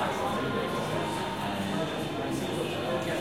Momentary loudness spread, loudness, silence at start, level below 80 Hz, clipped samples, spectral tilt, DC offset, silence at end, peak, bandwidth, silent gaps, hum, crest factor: 2 LU; -31 LUFS; 0 s; -56 dBFS; under 0.1%; -5 dB/octave; 0.2%; 0 s; -18 dBFS; 16.5 kHz; none; none; 14 dB